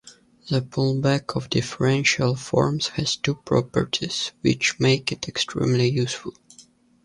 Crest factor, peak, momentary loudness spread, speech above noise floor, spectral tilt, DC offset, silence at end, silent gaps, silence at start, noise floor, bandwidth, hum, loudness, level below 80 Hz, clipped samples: 18 dB; -4 dBFS; 7 LU; 31 dB; -5 dB/octave; under 0.1%; 0.45 s; none; 0.05 s; -53 dBFS; 11.5 kHz; none; -23 LUFS; -52 dBFS; under 0.1%